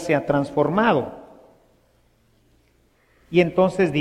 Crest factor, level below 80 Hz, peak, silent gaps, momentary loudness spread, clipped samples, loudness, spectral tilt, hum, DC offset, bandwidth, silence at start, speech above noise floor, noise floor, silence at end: 18 dB; -54 dBFS; -4 dBFS; none; 8 LU; under 0.1%; -20 LUFS; -7 dB/octave; none; under 0.1%; 12 kHz; 0 s; 41 dB; -61 dBFS; 0 s